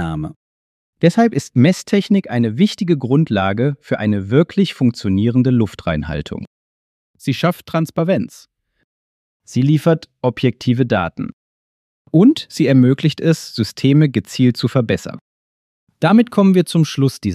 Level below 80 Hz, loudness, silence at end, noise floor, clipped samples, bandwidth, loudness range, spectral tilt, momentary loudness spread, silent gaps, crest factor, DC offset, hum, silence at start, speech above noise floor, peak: -46 dBFS; -16 LUFS; 0 s; under -90 dBFS; under 0.1%; 14 kHz; 5 LU; -7 dB/octave; 10 LU; 0.36-0.93 s, 6.47-7.14 s, 8.84-9.40 s, 11.33-12.05 s, 15.21-15.87 s; 16 dB; under 0.1%; none; 0 s; over 75 dB; 0 dBFS